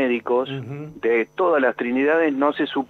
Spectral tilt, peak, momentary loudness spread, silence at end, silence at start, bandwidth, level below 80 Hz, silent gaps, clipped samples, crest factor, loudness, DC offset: -7.5 dB/octave; -6 dBFS; 9 LU; 0.05 s; 0 s; 6.4 kHz; -64 dBFS; none; under 0.1%; 14 dB; -21 LUFS; under 0.1%